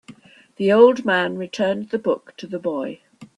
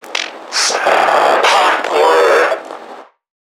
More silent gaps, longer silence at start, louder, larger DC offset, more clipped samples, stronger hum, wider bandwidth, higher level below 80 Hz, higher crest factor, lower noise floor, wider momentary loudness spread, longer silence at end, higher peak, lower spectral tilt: neither; about the same, 0.1 s vs 0.05 s; second, -20 LUFS vs -12 LUFS; neither; neither; neither; second, 10 kHz vs 17.5 kHz; about the same, -66 dBFS vs -66 dBFS; about the same, 18 dB vs 14 dB; first, -46 dBFS vs -35 dBFS; first, 15 LU vs 11 LU; second, 0.1 s vs 0.45 s; about the same, -2 dBFS vs 0 dBFS; first, -6 dB/octave vs 0 dB/octave